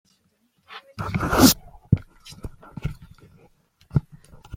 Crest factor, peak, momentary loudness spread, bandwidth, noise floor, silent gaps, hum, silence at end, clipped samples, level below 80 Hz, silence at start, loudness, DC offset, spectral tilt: 24 dB; -2 dBFS; 25 LU; 16.5 kHz; -67 dBFS; none; none; 0 s; under 0.1%; -40 dBFS; 0.7 s; -22 LUFS; under 0.1%; -4.5 dB/octave